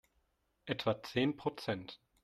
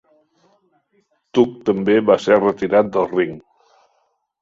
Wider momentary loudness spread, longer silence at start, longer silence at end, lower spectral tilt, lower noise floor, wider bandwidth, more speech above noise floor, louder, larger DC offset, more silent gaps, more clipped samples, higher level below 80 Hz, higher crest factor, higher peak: first, 13 LU vs 8 LU; second, 0.65 s vs 1.35 s; second, 0.25 s vs 1 s; about the same, -6 dB/octave vs -7 dB/octave; first, -78 dBFS vs -66 dBFS; first, 14 kHz vs 7.6 kHz; second, 41 dB vs 50 dB; second, -37 LUFS vs -17 LUFS; neither; neither; neither; second, -72 dBFS vs -58 dBFS; about the same, 22 dB vs 18 dB; second, -18 dBFS vs -2 dBFS